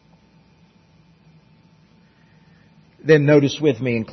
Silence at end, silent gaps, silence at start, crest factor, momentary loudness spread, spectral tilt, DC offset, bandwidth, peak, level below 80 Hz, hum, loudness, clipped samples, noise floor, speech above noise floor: 0 s; none; 3.05 s; 20 dB; 10 LU; -7 dB/octave; under 0.1%; 6.2 kHz; -2 dBFS; -62 dBFS; none; -17 LUFS; under 0.1%; -54 dBFS; 38 dB